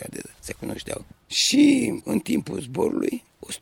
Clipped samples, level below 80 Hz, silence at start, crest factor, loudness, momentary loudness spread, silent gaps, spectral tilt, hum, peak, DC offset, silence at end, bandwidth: under 0.1%; -54 dBFS; 0 s; 18 dB; -23 LUFS; 19 LU; none; -3.5 dB/octave; none; -6 dBFS; under 0.1%; 0.05 s; 17.5 kHz